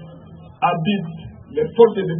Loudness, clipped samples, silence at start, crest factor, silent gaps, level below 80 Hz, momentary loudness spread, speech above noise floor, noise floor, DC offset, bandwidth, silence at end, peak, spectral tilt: -19 LUFS; under 0.1%; 0 s; 20 dB; none; -52 dBFS; 20 LU; 23 dB; -41 dBFS; under 0.1%; 3.7 kHz; 0 s; 0 dBFS; -11.5 dB/octave